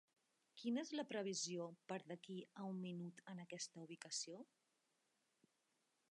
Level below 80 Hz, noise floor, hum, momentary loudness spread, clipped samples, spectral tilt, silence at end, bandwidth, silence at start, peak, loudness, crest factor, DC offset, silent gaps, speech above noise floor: under -90 dBFS; -86 dBFS; none; 11 LU; under 0.1%; -4 dB/octave; 1.65 s; 11 kHz; 0.55 s; -34 dBFS; -49 LUFS; 18 dB; under 0.1%; none; 37 dB